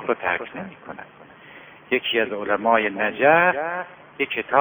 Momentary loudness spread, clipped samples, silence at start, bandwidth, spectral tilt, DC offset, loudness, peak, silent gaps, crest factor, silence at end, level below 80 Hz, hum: 20 LU; under 0.1%; 0 s; over 20 kHz; -9 dB/octave; under 0.1%; -21 LUFS; -2 dBFS; none; 22 dB; 0 s; -64 dBFS; none